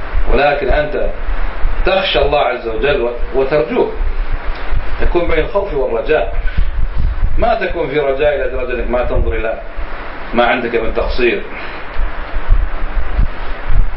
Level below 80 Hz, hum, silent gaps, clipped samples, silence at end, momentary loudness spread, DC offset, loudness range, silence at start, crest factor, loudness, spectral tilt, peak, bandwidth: -18 dBFS; none; none; under 0.1%; 0 s; 11 LU; under 0.1%; 2 LU; 0 s; 12 dB; -17 LUFS; -10.5 dB/octave; 0 dBFS; 5.6 kHz